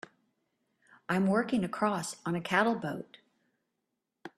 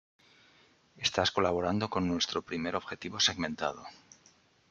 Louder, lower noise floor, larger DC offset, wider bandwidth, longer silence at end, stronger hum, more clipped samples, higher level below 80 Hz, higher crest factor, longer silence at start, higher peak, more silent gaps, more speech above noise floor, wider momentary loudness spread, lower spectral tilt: about the same, -31 LUFS vs -31 LUFS; first, -84 dBFS vs -64 dBFS; neither; first, 13 kHz vs 8.8 kHz; second, 0.1 s vs 0.75 s; neither; neither; about the same, -70 dBFS vs -68 dBFS; about the same, 22 dB vs 24 dB; first, 1.1 s vs 0.95 s; about the same, -12 dBFS vs -10 dBFS; neither; first, 54 dB vs 33 dB; first, 19 LU vs 9 LU; first, -5.5 dB/octave vs -3.5 dB/octave